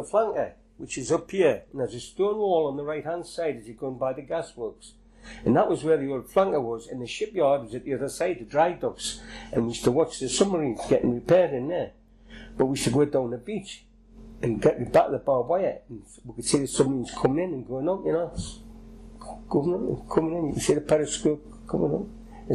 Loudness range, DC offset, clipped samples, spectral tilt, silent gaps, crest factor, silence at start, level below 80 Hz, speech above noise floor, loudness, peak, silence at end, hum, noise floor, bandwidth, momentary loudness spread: 4 LU; under 0.1%; under 0.1%; -5.5 dB/octave; none; 16 dB; 0 s; -50 dBFS; 22 dB; -26 LUFS; -10 dBFS; 0 s; none; -48 dBFS; 13 kHz; 14 LU